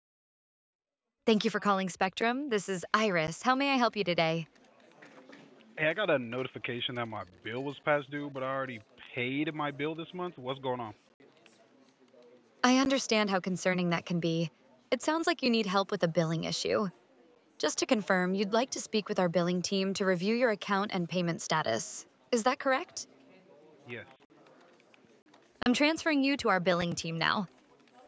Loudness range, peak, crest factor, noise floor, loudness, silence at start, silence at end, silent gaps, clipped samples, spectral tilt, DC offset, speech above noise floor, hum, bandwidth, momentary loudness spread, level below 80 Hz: 6 LU; -10 dBFS; 22 dB; -63 dBFS; -31 LUFS; 1.25 s; 0.6 s; 11.14-11.20 s, 24.25-24.30 s, 25.22-25.26 s; under 0.1%; -4.5 dB/octave; under 0.1%; 32 dB; none; 8 kHz; 11 LU; -70 dBFS